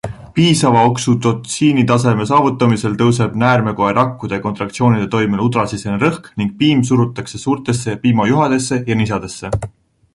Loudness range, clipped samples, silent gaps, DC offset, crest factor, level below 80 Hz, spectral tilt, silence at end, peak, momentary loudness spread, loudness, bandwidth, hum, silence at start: 3 LU; under 0.1%; none; under 0.1%; 14 dB; -44 dBFS; -6 dB/octave; 0.45 s; 0 dBFS; 9 LU; -15 LUFS; 11.5 kHz; none; 0.05 s